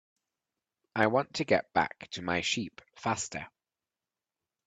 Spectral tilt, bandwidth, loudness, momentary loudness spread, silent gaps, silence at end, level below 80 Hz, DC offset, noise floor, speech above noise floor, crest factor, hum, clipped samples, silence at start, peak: -3.5 dB/octave; 9.4 kHz; -31 LUFS; 12 LU; none; 1.2 s; -68 dBFS; under 0.1%; under -90 dBFS; over 59 dB; 24 dB; none; under 0.1%; 0.95 s; -10 dBFS